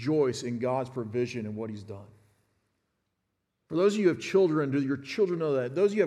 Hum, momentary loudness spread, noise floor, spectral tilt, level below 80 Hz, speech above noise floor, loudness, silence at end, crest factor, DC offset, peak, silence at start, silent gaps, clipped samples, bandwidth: none; 13 LU; -81 dBFS; -6.5 dB/octave; -74 dBFS; 53 dB; -28 LUFS; 0 s; 18 dB; under 0.1%; -12 dBFS; 0 s; none; under 0.1%; 11 kHz